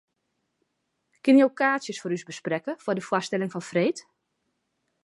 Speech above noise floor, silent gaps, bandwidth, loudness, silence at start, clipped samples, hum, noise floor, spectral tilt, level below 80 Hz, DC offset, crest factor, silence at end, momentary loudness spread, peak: 53 dB; none; 11.5 kHz; -25 LUFS; 1.25 s; under 0.1%; none; -78 dBFS; -5.5 dB/octave; -80 dBFS; under 0.1%; 20 dB; 1.05 s; 12 LU; -8 dBFS